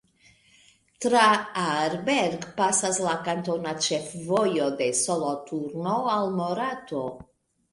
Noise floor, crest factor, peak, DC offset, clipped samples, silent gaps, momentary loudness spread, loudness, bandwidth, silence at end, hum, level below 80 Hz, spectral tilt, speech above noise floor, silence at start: -60 dBFS; 20 dB; -8 dBFS; under 0.1%; under 0.1%; none; 10 LU; -25 LUFS; 11.5 kHz; 0.5 s; none; -66 dBFS; -3.5 dB/octave; 34 dB; 1 s